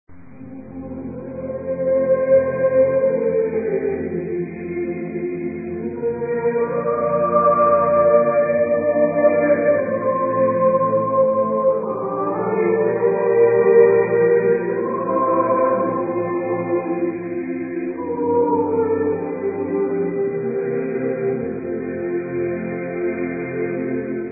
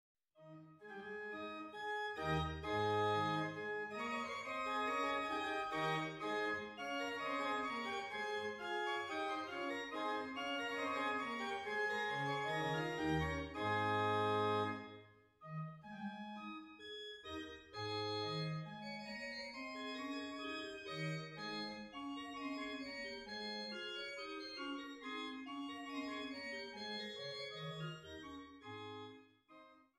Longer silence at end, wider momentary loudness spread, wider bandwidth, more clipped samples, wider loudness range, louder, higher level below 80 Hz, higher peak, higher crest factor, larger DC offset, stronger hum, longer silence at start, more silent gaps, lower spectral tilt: second, 0 s vs 0.15 s; about the same, 11 LU vs 12 LU; second, 2.7 kHz vs 14.5 kHz; neither; about the same, 7 LU vs 7 LU; first, -19 LUFS vs -42 LUFS; first, -52 dBFS vs -66 dBFS; first, -2 dBFS vs -24 dBFS; about the same, 18 dB vs 18 dB; neither; neither; second, 0.1 s vs 0.4 s; neither; first, -15.5 dB/octave vs -5 dB/octave